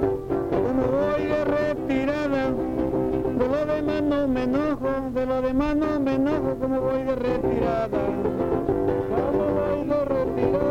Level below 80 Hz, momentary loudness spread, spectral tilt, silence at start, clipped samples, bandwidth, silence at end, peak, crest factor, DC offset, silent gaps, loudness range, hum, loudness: -42 dBFS; 2 LU; -8 dB/octave; 0 s; under 0.1%; 15.5 kHz; 0 s; -10 dBFS; 14 dB; under 0.1%; none; 0 LU; none; -24 LUFS